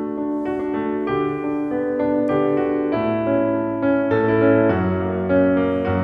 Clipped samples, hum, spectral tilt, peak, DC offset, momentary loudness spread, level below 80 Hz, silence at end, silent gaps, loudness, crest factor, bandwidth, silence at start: under 0.1%; none; -10 dB/octave; -4 dBFS; under 0.1%; 7 LU; -50 dBFS; 0 s; none; -20 LUFS; 16 dB; 4.7 kHz; 0 s